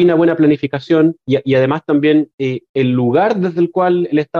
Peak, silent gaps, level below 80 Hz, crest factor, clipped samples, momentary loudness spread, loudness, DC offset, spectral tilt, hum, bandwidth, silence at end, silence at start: -4 dBFS; 2.34-2.38 s, 2.69-2.74 s; -58 dBFS; 10 dB; under 0.1%; 6 LU; -14 LUFS; under 0.1%; -9 dB/octave; none; 6.6 kHz; 0 s; 0 s